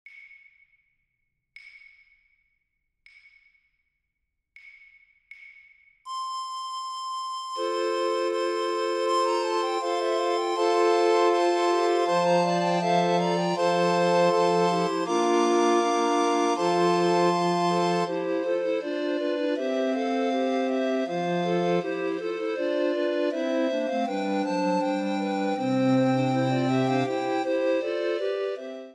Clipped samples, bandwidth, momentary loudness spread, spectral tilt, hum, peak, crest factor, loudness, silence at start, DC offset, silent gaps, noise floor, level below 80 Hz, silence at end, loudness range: under 0.1%; 11 kHz; 7 LU; -5.5 dB/octave; none; -10 dBFS; 16 dB; -25 LUFS; 0.05 s; under 0.1%; none; -80 dBFS; -78 dBFS; 0 s; 7 LU